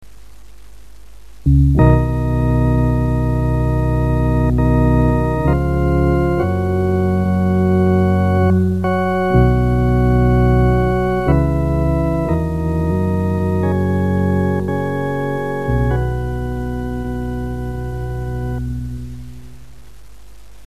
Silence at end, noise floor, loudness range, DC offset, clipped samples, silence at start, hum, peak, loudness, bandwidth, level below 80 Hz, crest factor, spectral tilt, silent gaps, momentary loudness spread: 0.85 s; -42 dBFS; 8 LU; 2%; under 0.1%; 0.75 s; none; 0 dBFS; -17 LUFS; 13.5 kHz; -24 dBFS; 16 dB; -9.5 dB/octave; none; 10 LU